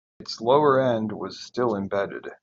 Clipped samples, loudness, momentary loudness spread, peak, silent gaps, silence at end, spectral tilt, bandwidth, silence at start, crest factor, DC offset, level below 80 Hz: under 0.1%; -24 LUFS; 14 LU; -6 dBFS; none; 0.1 s; -6 dB/octave; 7.8 kHz; 0.2 s; 18 dB; under 0.1%; -66 dBFS